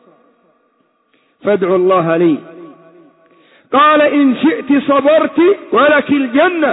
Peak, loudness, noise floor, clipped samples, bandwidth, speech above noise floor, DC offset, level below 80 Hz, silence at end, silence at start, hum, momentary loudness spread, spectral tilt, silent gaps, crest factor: -2 dBFS; -12 LUFS; -59 dBFS; under 0.1%; 4 kHz; 48 dB; under 0.1%; -62 dBFS; 0 s; 1.45 s; none; 6 LU; -9.5 dB/octave; none; 12 dB